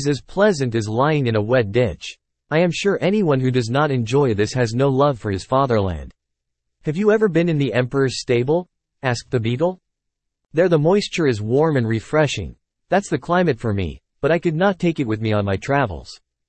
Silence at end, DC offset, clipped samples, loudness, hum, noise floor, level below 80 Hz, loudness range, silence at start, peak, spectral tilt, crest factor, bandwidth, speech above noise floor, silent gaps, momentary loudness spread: 0.35 s; under 0.1%; under 0.1%; -19 LUFS; none; -79 dBFS; -46 dBFS; 2 LU; 0 s; -4 dBFS; -6.5 dB/octave; 16 dB; 8.8 kHz; 60 dB; none; 8 LU